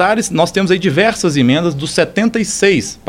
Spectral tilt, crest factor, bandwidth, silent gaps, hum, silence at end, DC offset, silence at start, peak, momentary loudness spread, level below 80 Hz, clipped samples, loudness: -4.5 dB/octave; 14 dB; 16 kHz; none; none; 0.15 s; under 0.1%; 0 s; 0 dBFS; 3 LU; -44 dBFS; under 0.1%; -13 LUFS